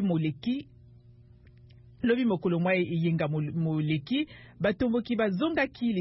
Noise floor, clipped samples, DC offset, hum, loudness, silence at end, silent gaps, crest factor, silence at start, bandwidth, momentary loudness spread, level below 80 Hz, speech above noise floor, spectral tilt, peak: -54 dBFS; under 0.1%; under 0.1%; none; -29 LUFS; 0 s; none; 16 dB; 0 s; 5.8 kHz; 6 LU; -58 dBFS; 27 dB; -11 dB/octave; -12 dBFS